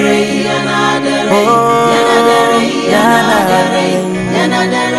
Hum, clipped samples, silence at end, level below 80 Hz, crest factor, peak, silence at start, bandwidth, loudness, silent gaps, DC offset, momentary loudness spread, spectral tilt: none; 0.4%; 0 s; -46 dBFS; 10 dB; 0 dBFS; 0 s; 15.5 kHz; -10 LUFS; none; under 0.1%; 4 LU; -4.5 dB/octave